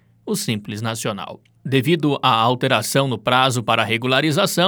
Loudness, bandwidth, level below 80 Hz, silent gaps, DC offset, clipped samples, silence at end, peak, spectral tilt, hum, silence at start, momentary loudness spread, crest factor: -19 LUFS; over 20 kHz; -64 dBFS; none; under 0.1%; under 0.1%; 0 s; 0 dBFS; -4.5 dB/octave; none; 0.25 s; 10 LU; 18 dB